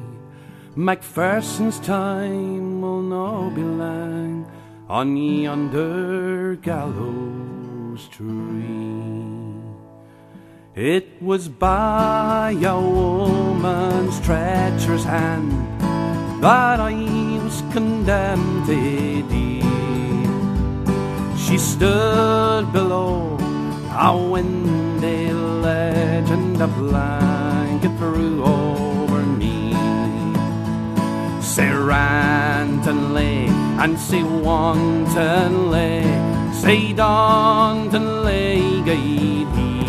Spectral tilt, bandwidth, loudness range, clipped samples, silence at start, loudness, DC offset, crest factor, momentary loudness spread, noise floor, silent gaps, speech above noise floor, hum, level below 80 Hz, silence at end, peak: -6 dB/octave; 14 kHz; 8 LU; under 0.1%; 0 s; -19 LUFS; under 0.1%; 18 dB; 10 LU; -44 dBFS; none; 26 dB; none; -34 dBFS; 0 s; 0 dBFS